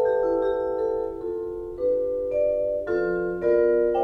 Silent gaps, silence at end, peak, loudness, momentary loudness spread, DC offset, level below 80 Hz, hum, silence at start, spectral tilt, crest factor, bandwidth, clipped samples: none; 0 s; -10 dBFS; -25 LUFS; 9 LU; under 0.1%; -50 dBFS; none; 0 s; -8.5 dB/octave; 14 dB; 4.8 kHz; under 0.1%